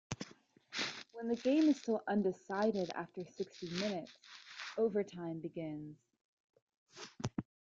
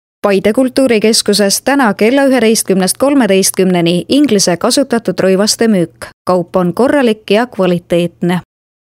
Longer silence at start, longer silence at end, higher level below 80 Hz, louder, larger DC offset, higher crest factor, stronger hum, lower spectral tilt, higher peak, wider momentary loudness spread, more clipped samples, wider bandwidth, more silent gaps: second, 0.1 s vs 0.25 s; second, 0.25 s vs 0.4 s; second, -72 dBFS vs -50 dBFS; second, -38 LUFS vs -11 LUFS; neither; first, 18 dB vs 12 dB; neither; first, -5.5 dB/octave vs -4 dB/octave; second, -20 dBFS vs 0 dBFS; first, 18 LU vs 6 LU; neither; second, 7.8 kHz vs 16.5 kHz; first, 6.21-6.48 s, 6.62-6.67 s, 6.77-6.86 s vs 6.13-6.25 s